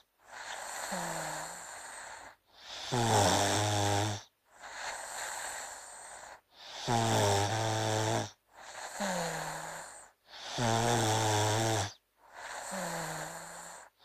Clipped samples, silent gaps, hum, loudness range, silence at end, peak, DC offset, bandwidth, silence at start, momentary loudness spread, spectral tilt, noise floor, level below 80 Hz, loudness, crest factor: under 0.1%; none; none; 4 LU; 0.2 s; -14 dBFS; under 0.1%; 15.5 kHz; 0.25 s; 20 LU; -3.5 dB/octave; -55 dBFS; -60 dBFS; -33 LUFS; 20 dB